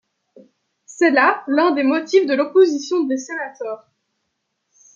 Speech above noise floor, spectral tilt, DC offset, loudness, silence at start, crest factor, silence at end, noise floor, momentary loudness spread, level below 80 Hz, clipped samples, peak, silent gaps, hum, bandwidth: 57 dB; -3 dB/octave; under 0.1%; -17 LUFS; 0.9 s; 18 dB; 1.2 s; -74 dBFS; 13 LU; -78 dBFS; under 0.1%; -2 dBFS; none; none; 7.4 kHz